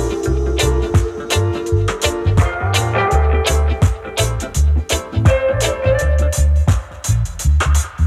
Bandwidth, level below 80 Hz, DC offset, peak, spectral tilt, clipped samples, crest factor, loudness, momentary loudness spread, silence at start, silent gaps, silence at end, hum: 14.5 kHz; -18 dBFS; under 0.1%; 0 dBFS; -5 dB/octave; under 0.1%; 14 dB; -17 LUFS; 4 LU; 0 s; none; 0 s; none